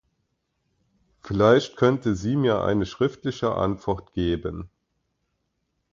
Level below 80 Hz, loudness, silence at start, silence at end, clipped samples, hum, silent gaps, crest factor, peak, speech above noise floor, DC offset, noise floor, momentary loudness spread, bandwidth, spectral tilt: -46 dBFS; -23 LUFS; 1.25 s; 1.3 s; under 0.1%; none; none; 22 dB; -4 dBFS; 53 dB; under 0.1%; -76 dBFS; 11 LU; 7.6 kHz; -7 dB/octave